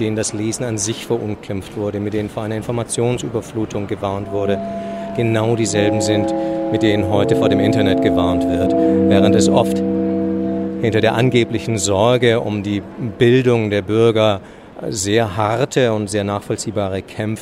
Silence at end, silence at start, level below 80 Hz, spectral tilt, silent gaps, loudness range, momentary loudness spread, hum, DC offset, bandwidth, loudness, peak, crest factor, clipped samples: 0 s; 0 s; -46 dBFS; -5.5 dB/octave; none; 7 LU; 10 LU; none; under 0.1%; 15 kHz; -17 LUFS; 0 dBFS; 16 dB; under 0.1%